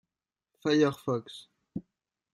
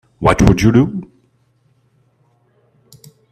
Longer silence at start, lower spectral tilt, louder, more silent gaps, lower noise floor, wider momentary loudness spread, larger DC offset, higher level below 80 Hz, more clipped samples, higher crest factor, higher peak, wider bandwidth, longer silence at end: first, 0.65 s vs 0.2 s; about the same, -6 dB/octave vs -7 dB/octave; second, -29 LUFS vs -13 LUFS; neither; first, under -90 dBFS vs -58 dBFS; first, 20 LU vs 10 LU; neither; second, -72 dBFS vs -32 dBFS; neither; about the same, 20 dB vs 18 dB; second, -12 dBFS vs 0 dBFS; about the same, 13 kHz vs 14 kHz; second, 0.55 s vs 2.3 s